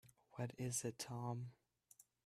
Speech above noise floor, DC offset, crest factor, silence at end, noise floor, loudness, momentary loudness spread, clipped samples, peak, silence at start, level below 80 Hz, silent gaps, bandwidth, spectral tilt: 25 dB; under 0.1%; 20 dB; 0.25 s; -71 dBFS; -47 LUFS; 19 LU; under 0.1%; -30 dBFS; 0.05 s; -80 dBFS; none; 15 kHz; -4.5 dB/octave